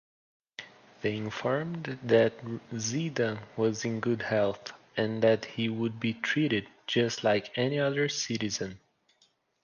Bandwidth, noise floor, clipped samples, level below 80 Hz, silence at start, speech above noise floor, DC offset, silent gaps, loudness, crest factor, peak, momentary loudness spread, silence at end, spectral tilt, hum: 10 kHz; -69 dBFS; under 0.1%; -68 dBFS; 0.6 s; 40 dB; under 0.1%; none; -30 LUFS; 20 dB; -10 dBFS; 11 LU; 0.85 s; -5 dB/octave; none